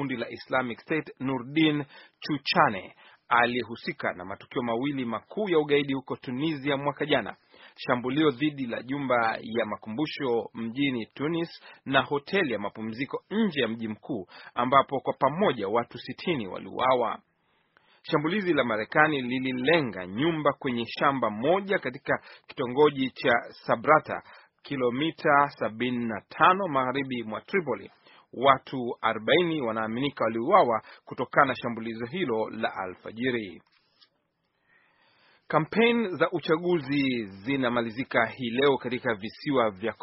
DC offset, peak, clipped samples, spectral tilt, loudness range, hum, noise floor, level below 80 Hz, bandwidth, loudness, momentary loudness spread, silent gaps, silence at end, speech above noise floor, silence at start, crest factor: under 0.1%; -2 dBFS; under 0.1%; -3.5 dB/octave; 4 LU; none; -75 dBFS; -66 dBFS; 5.8 kHz; -27 LUFS; 11 LU; none; 0.1 s; 48 dB; 0 s; 24 dB